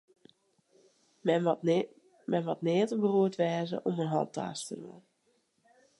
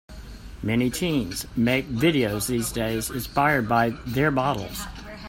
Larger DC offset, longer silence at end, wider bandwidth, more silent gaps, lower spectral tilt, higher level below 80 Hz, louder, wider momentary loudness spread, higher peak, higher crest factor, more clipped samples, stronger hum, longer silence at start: neither; first, 1 s vs 0 s; second, 11.5 kHz vs 16.5 kHz; neither; first, -6.5 dB/octave vs -5 dB/octave; second, -82 dBFS vs -42 dBFS; second, -31 LUFS vs -24 LUFS; about the same, 14 LU vs 12 LU; second, -14 dBFS vs -6 dBFS; about the same, 18 dB vs 18 dB; neither; neither; first, 1.25 s vs 0.1 s